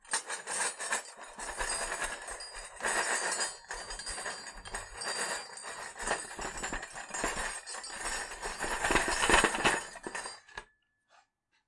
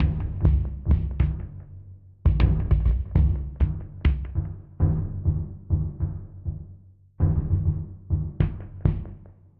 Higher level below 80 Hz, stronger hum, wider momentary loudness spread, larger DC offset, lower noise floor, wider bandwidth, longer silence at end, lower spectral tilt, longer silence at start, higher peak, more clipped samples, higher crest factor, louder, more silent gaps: second, -50 dBFS vs -28 dBFS; neither; about the same, 14 LU vs 12 LU; neither; first, -70 dBFS vs -49 dBFS; first, 11.5 kHz vs 4.3 kHz; first, 1.05 s vs 0.3 s; second, -1 dB/octave vs -11.5 dB/octave; about the same, 0.05 s vs 0 s; about the same, -8 dBFS vs -6 dBFS; neither; first, 28 dB vs 18 dB; second, -34 LUFS vs -26 LUFS; neither